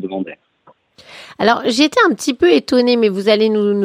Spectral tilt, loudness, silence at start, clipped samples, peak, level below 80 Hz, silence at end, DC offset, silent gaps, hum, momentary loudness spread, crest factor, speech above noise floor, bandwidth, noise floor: -4.5 dB/octave; -14 LUFS; 0 s; under 0.1%; 0 dBFS; -56 dBFS; 0 s; under 0.1%; none; none; 8 LU; 16 dB; 38 dB; 15.5 kHz; -52 dBFS